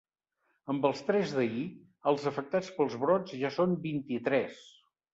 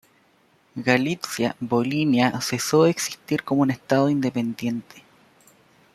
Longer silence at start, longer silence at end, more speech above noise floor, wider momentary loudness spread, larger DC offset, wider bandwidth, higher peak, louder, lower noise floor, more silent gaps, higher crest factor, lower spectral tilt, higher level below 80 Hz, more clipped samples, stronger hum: about the same, 0.65 s vs 0.75 s; second, 0.45 s vs 0.95 s; first, 48 dB vs 38 dB; about the same, 9 LU vs 9 LU; neither; second, 8 kHz vs 15 kHz; second, -12 dBFS vs -2 dBFS; second, -31 LUFS vs -23 LUFS; first, -78 dBFS vs -61 dBFS; neither; about the same, 20 dB vs 20 dB; first, -6.5 dB/octave vs -5 dB/octave; second, -74 dBFS vs -64 dBFS; neither; neither